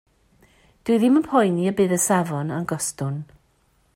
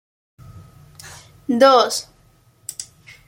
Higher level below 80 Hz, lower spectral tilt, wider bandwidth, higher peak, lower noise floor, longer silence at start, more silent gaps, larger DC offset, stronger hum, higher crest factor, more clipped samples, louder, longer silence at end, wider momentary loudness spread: about the same, -60 dBFS vs -58 dBFS; first, -5.5 dB/octave vs -3 dB/octave; about the same, 16 kHz vs 16.5 kHz; second, -6 dBFS vs -2 dBFS; first, -63 dBFS vs -55 dBFS; first, 0.85 s vs 0.5 s; neither; neither; neither; about the same, 16 dB vs 20 dB; neither; second, -21 LUFS vs -16 LUFS; first, 0.7 s vs 0.45 s; second, 11 LU vs 27 LU